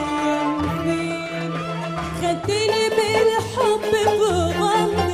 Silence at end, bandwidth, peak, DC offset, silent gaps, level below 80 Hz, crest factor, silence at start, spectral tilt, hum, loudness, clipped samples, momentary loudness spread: 0 s; 15.5 kHz; -6 dBFS; under 0.1%; none; -48 dBFS; 14 dB; 0 s; -5 dB/octave; none; -21 LUFS; under 0.1%; 8 LU